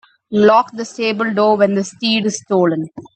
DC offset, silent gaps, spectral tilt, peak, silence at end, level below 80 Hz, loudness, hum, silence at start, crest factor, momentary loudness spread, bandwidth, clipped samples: under 0.1%; none; -5 dB/octave; 0 dBFS; 0.15 s; -64 dBFS; -16 LUFS; none; 0.3 s; 16 dB; 9 LU; 8.8 kHz; under 0.1%